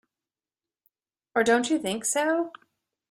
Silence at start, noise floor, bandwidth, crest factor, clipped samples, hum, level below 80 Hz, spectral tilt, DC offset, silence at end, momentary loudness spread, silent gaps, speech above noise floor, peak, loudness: 1.35 s; under -90 dBFS; 15.5 kHz; 20 dB; under 0.1%; none; -70 dBFS; -2.5 dB/octave; under 0.1%; 0.6 s; 7 LU; none; over 65 dB; -8 dBFS; -25 LUFS